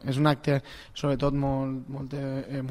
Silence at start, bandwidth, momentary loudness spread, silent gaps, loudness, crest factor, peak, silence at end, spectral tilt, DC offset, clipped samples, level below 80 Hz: 0 s; 13 kHz; 10 LU; none; -28 LUFS; 20 dB; -8 dBFS; 0 s; -7.5 dB/octave; under 0.1%; under 0.1%; -46 dBFS